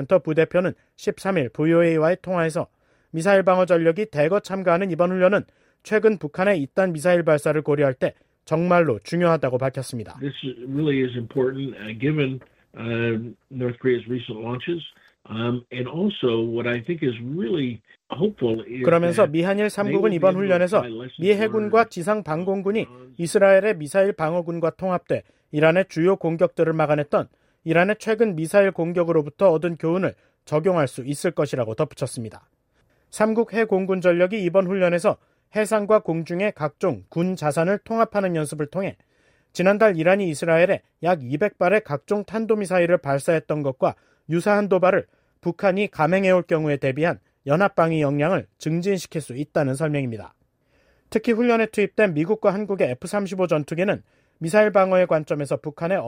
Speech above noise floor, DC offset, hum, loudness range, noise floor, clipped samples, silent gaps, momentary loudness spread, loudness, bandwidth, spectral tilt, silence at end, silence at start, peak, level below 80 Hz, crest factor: 43 dB; under 0.1%; none; 5 LU; -65 dBFS; under 0.1%; none; 11 LU; -22 LUFS; 16 kHz; -6.5 dB/octave; 0 s; 0 s; -6 dBFS; -62 dBFS; 16 dB